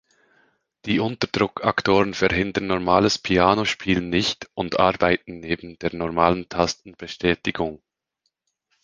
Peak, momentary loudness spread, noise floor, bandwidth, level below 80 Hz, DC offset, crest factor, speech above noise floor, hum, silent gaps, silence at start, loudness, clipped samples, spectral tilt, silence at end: 0 dBFS; 10 LU; -76 dBFS; 9.8 kHz; -46 dBFS; under 0.1%; 22 dB; 54 dB; none; none; 0.85 s; -22 LUFS; under 0.1%; -5 dB/octave; 1.1 s